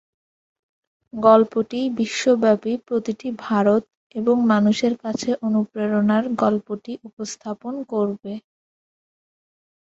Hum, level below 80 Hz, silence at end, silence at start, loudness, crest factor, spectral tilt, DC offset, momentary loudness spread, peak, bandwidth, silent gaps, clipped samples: none; -64 dBFS; 1.4 s; 1.15 s; -21 LUFS; 20 dB; -6 dB/octave; under 0.1%; 15 LU; -2 dBFS; 8 kHz; 3.97-4.10 s, 7.13-7.17 s; under 0.1%